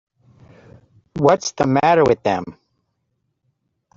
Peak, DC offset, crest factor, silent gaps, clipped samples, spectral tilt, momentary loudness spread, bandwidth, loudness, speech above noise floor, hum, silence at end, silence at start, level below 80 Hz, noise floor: -2 dBFS; under 0.1%; 18 dB; none; under 0.1%; -5.5 dB/octave; 14 LU; 7.8 kHz; -17 LUFS; 56 dB; none; 1.45 s; 1.15 s; -54 dBFS; -72 dBFS